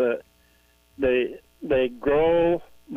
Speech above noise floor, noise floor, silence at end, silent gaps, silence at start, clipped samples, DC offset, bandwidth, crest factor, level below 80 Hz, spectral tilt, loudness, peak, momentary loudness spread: 38 dB; -60 dBFS; 0 s; none; 0 s; under 0.1%; under 0.1%; 4.4 kHz; 14 dB; -46 dBFS; -7.5 dB/octave; -24 LUFS; -10 dBFS; 11 LU